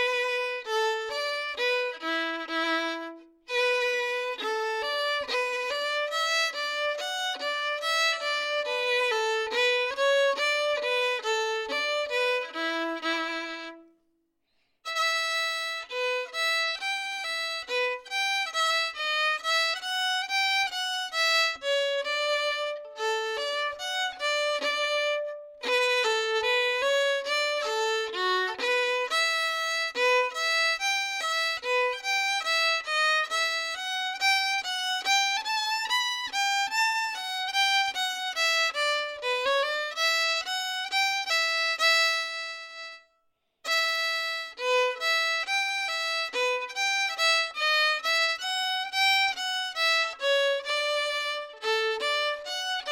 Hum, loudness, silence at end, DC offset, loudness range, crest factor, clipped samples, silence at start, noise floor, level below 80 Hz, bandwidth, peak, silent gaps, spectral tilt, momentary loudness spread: none; -26 LUFS; 0 s; under 0.1%; 4 LU; 16 dB; under 0.1%; 0 s; -73 dBFS; -74 dBFS; 17 kHz; -12 dBFS; none; 2 dB/octave; 6 LU